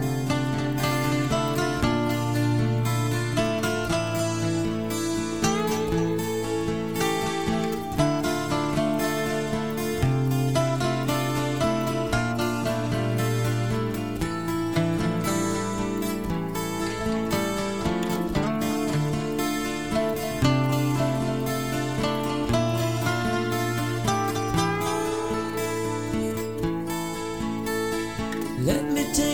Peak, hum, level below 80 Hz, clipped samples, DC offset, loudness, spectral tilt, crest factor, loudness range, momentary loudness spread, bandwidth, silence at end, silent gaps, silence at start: -8 dBFS; none; -44 dBFS; under 0.1%; 0.5%; -26 LUFS; -5.5 dB/octave; 16 dB; 2 LU; 4 LU; 17.5 kHz; 0 s; none; 0 s